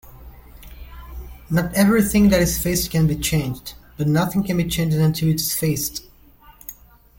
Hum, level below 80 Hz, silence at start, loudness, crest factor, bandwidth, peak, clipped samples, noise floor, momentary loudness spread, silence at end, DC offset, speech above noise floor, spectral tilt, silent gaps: none; -38 dBFS; 0.05 s; -19 LUFS; 18 dB; 17 kHz; -4 dBFS; under 0.1%; -49 dBFS; 22 LU; 0.45 s; under 0.1%; 30 dB; -5 dB/octave; none